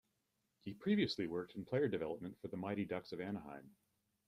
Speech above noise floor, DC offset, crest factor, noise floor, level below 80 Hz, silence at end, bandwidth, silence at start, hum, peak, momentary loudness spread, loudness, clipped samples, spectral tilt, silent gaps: 44 dB; under 0.1%; 20 dB; -85 dBFS; -76 dBFS; 0.55 s; 11 kHz; 0.65 s; none; -22 dBFS; 15 LU; -41 LUFS; under 0.1%; -7 dB/octave; none